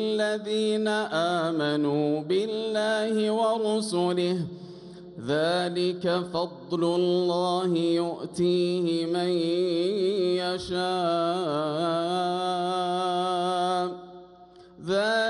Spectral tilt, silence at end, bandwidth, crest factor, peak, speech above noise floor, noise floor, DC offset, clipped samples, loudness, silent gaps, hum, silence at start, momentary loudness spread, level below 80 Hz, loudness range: -5.5 dB/octave; 0 s; 11.5 kHz; 12 dB; -14 dBFS; 25 dB; -51 dBFS; under 0.1%; under 0.1%; -26 LUFS; none; none; 0 s; 6 LU; -66 dBFS; 2 LU